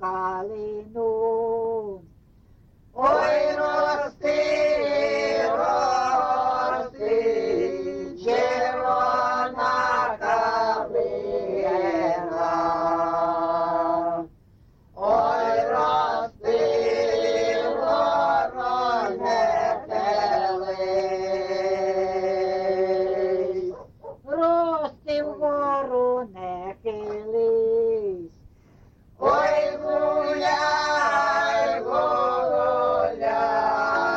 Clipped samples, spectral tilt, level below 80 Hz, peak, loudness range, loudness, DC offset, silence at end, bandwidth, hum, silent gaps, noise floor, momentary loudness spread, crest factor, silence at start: under 0.1%; -4.5 dB/octave; -56 dBFS; -8 dBFS; 3 LU; -23 LUFS; under 0.1%; 0 s; 8 kHz; none; none; -54 dBFS; 7 LU; 16 dB; 0 s